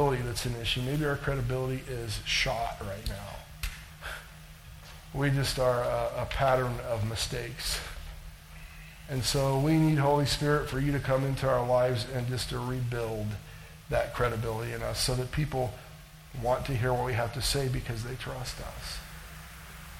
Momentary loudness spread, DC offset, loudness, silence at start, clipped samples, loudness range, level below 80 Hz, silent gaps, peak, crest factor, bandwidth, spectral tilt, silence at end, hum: 19 LU; under 0.1%; -30 LUFS; 0 s; under 0.1%; 6 LU; -44 dBFS; none; -12 dBFS; 18 dB; 17 kHz; -5 dB/octave; 0 s; none